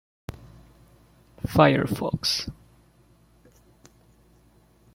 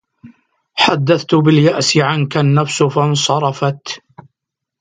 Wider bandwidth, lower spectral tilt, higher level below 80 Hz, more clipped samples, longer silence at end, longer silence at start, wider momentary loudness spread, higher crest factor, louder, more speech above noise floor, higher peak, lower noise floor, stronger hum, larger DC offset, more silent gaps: first, 16.5 kHz vs 9.4 kHz; about the same, -5 dB/octave vs -5 dB/octave; first, -50 dBFS vs -56 dBFS; neither; first, 2.4 s vs 0.85 s; about the same, 0.3 s vs 0.25 s; first, 24 LU vs 11 LU; first, 26 dB vs 16 dB; second, -23 LUFS vs -14 LUFS; second, 36 dB vs 64 dB; about the same, -2 dBFS vs 0 dBFS; second, -59 dBFS vs -78 dBFS; neither; neither; neither